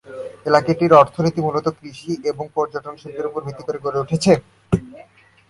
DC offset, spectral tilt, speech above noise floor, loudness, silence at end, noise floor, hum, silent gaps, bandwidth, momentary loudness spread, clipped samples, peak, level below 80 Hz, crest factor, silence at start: under 0.1%; -6.5 dB/octave; 29 dB; -19 LUFS; 0.45 s; -48 dBFS; none; none; 11.5 kHz; 16 LU; under 0.1%; 0 dBFS; -48 dBFS; 20 dB; 0.1 s